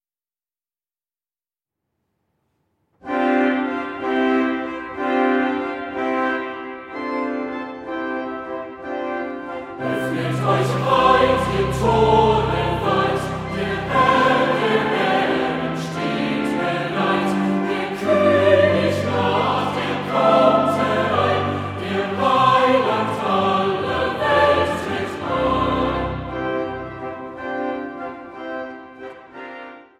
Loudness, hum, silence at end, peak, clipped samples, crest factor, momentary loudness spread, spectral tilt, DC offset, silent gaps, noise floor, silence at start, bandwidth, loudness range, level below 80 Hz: -20 LUFS; none; 0.2 s; -2 dBFS; under 0.1%; 18 dB; 15 LU; -6 dB/octave; under 0.1%; none; under -90 dBFS; 3.05 s; 15.5 kHz; 9 LU; -44 dBFS